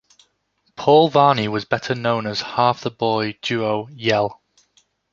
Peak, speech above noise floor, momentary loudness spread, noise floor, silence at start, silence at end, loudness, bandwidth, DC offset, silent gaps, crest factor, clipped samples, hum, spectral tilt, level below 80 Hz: -2 dBFS; 49 dB; 9 LU; -67 dBFS; 0.8 s; 0.8 s; -19 LUFS; 7.4 kHz; under 0.1%; none; 18 dB; under 0.1%; none; -6 dB/octave; -60 dBFS